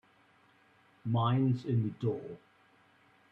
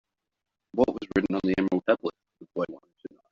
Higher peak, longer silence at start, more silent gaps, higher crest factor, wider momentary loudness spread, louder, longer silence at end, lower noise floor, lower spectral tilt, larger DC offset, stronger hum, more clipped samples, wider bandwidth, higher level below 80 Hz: second, -18 dBFS vs -8 dBFS; first, 1.05 s vs 0.75 s; neither; about the same, 16 dB vs 20 dB; about the same, 17 LU vs 17 LU; second, -32 LUFS vs -28 LUFS; first, 0.95 s vs 0.25 s; first, -66 dBFS vs -48 dBFS; first, -9.5 dB/octave vs -5.5 dB/octave; neither; neither; neither; second, 5.4 kHz vs 7.4 kHz; second, -70 dBFS vs -58 dBFS